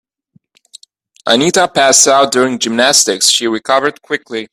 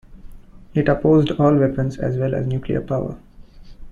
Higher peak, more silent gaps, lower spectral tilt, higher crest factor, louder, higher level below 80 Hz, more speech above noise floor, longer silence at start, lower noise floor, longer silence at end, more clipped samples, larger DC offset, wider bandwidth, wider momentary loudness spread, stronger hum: first, 0 dBFS vs -4 dBFS; neither; second, -1.5 dB/octave vs -9 dB/octave; about the same, 14 dB vs 16 dB; first, -10 LUFS vs -19 LUFS; second, -58 dBFS vs -40 dBFS; first, 43 dB vs 22 dB; first, 1.25 s vs 0.1 s; first, -55 dBFS vs -40 dBFS; about the same, 0.1 s vs 0 s; neither; neither; first, over 20 kHz vs 7.2 kHz; about the same, 12 LU vs 10 LU; neither